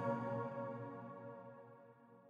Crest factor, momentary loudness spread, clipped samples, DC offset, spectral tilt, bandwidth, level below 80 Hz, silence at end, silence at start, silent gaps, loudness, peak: 16 dB; 19 LU; under 0.1%; under 0.1%; -9.5 dB/octave; 7.2 kHz; -88 dBFS; 0 s; 0 s; none; -46 LUFS; -30 dBFS